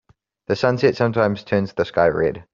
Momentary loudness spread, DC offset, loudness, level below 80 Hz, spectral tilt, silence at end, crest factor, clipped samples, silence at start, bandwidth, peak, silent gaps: 5 LU; under 0.1%; -20 LUFS; -52 dBFS; -5.5 dB/octave; 0.1 s; 18 dB; under 0.1%; 0.5 s; 7.4 kHz; -2 dBFS; none